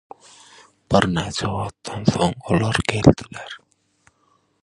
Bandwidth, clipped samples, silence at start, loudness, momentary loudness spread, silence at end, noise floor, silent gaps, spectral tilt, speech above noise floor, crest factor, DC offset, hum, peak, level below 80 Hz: 11.5 kHz; under 0.1%; 0.9 s; -20 LUFS; 18 LU; 1.05 s; -63 dBFS; none; -6 dB/octave; 44 dB; 22 dB; under 0.1%; none; 0 dBFS; -40 dBFS